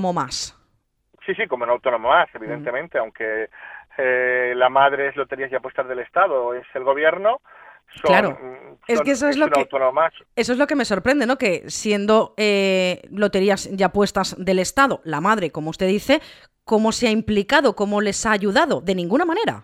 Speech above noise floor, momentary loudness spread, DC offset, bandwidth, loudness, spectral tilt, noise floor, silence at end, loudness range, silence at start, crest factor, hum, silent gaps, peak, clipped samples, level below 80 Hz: 47 dB; 9 LU; under 0.1%; 15.5 kHz; -20 LUFS; -4.5 dB/octave; -67 dBFS; 0 s; 2 LU; 0 s; 20 dB; none; none; 0 dBFS; under 0.1%; -52 dBFS